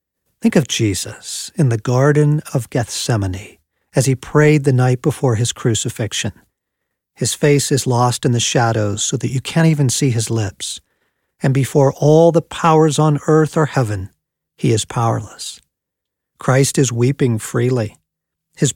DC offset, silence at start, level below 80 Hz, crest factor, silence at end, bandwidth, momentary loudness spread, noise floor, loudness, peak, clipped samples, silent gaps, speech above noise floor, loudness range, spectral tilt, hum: under 0.1%; 0.45 s; -52 dBFS; 16 dB; 0.05 s; 16.5 kHz; 11 LU; -80 dBFS; -16 LUFS; 0 dBFS; under 0.1%; none; 65 dB; 4 LU; -5.5 dB/octave; none